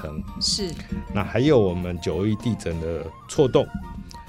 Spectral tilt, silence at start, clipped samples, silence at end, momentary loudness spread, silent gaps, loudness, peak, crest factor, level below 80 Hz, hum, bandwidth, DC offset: -5.5 dB/octave; 0 s; under 0.1%; 0 s; 14 LU; none; -24 LUFS; -6 dBFS; 18 dB; -40 dBFS; none; 15.5 kHz; under 0.1%